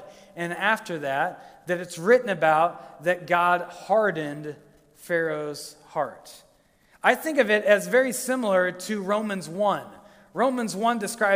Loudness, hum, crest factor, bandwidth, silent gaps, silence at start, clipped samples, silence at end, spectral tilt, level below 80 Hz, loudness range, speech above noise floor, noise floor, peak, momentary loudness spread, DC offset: -24 LUFS; none; 22 dB; 16 kHz; none; 0 s; under 0.1%; 0 s; -4 dB/octave; -70 dBFS; 5 LU; 36 dB; -60 dBFS; -4 dBFS; 12 LU; under 0.1%